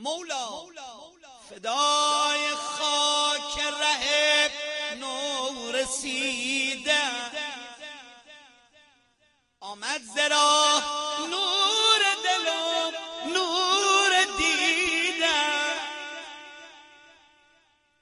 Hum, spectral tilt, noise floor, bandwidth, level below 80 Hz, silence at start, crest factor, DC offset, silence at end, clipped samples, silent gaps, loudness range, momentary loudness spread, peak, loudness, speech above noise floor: none; 0.5 dB/octave; -67 dBFS; 12 kHz; -62 dBFS; 0 s; 18 dB; under 0.1%; 1.2 s; under 0.1%; none; 7 LU; 18 LU; -8 dBFS; -24 LUFS; 41 dB